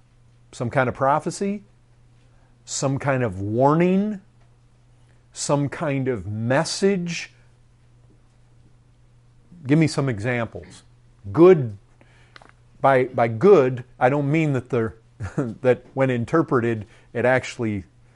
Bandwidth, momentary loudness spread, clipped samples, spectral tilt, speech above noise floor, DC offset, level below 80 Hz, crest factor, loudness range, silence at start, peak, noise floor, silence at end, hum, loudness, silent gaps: 11.5 kHz; 15 LU; under 0.1%; -6.5 dB/octave; 34 dB; under 0.1%; -56 dBFS; 18 dB; 7 LU; 0.5 s; -4 dBFS; -54 dBFS; 0.3 s; none; -21 LUFS; none